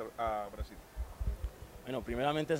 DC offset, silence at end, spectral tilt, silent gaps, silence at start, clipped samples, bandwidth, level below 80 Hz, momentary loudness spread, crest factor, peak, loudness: under 0.1%; 0 s; -6 dB/octave; none; 0 s; under 0.1%; 16 kHz; -44 dBFS; 13 LU; 20 dB; -18 dBFS; -39 LUFS